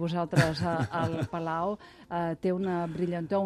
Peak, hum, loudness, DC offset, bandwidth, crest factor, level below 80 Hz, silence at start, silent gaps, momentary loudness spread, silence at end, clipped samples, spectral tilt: -10 dBFS; none; -30 LUFS; under 0.1%; 13.5 kHz; 20 dB; -56 dBFS; 0 s; none; 7 LU; 0 s; under 0.1%; -7 dB/octave